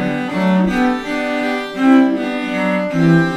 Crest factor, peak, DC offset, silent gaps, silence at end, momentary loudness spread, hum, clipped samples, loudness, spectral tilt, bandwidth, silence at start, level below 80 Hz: 14 dB; -2 dBFS; under 0.1%; none; 0 s; 7 LU; none; under 0.1%; -16 LUFS; -7 dB/octave; 11 kHz; 0 s; -44 dBFS